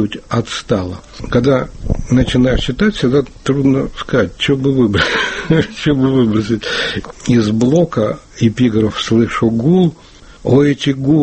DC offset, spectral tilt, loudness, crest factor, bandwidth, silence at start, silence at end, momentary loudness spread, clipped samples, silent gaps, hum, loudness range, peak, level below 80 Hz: under 0.1%; -6.5 dB/octave; -14 LUFS; 14 dB; 8.8 kHz; 0 s; 0 s; 6 LU; under 0.1%; none; none; 1 LU; 0 dBFS; -30 dBFS